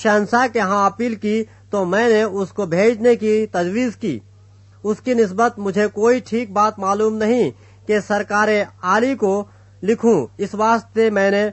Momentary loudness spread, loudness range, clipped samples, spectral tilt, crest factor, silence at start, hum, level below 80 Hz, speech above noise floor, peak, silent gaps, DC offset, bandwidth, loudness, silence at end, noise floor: 8 LU; 2 LU; under 0.1%; -5.5 dB/octave; 16 dB; 0 s; none; -58 dBFS; 29 dB; -2 dBFS; none; under 0.1%; 8.4 kHz; -18 LUFS; 0 s; -46 dBFS